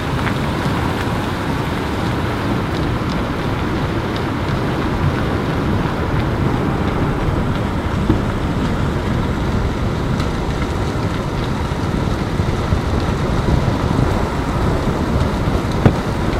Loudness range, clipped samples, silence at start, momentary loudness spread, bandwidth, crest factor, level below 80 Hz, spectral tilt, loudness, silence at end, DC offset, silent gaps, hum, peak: 2 LU; under 0.1%; 0 s; 3 LU; 15.5 kHz; 18 dB; -26 dBFS; -7 dB/octave; -19 LUFS; 0 s; under 0.1%; none; none; 0 dBFS